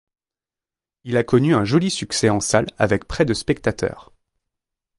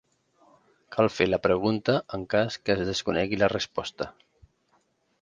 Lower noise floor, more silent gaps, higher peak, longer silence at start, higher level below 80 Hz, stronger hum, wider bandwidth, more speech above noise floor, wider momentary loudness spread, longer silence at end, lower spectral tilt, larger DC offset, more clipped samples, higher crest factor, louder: first, under -90 dBFS vs -69 dBFS; neither; first, -2 dBFS vs -6 dBFS; first, 1.05 s vs 0.9 s; first, -44 dBFS vs -54 dBFS; neither; first, 11.5 kHz vs 9.6 kHz; first, over 71 dB vs 43 dB; second, 7 LU vs 10 LU; about the same, 1 s vs 1.1 s; about the same, -5 dB/octave vs -5.5 dB/octave; neither; neither; about the same, 20 dB vs 22 dB; first, -20 LUFS vs -26 LUFS